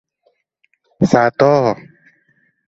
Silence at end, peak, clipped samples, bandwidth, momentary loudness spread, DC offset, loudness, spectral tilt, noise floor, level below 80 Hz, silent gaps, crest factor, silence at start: 0.95 s; 0 dBFS; under 0.1%; 8 kHz; 7 LU; under 0.1%; -14 LUFS; -7 dB/octave; -64 dBFS; -52 dBFS; none; 18 dB; 1 s